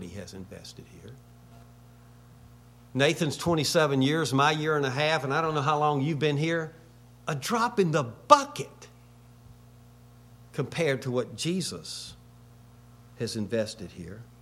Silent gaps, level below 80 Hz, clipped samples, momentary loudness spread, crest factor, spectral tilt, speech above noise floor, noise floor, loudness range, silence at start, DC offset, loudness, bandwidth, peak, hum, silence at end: none; -60 dBFS; under 0.1%; 19 LU; 28 dB; -5 dB/octave; 26 dB; -53 dBFS; 8 LU; 0 s; under 0.1%; -27 LUFS; 16 kHz; -2 dBFS; 60 Hz at -55 dBFS; 0.2 s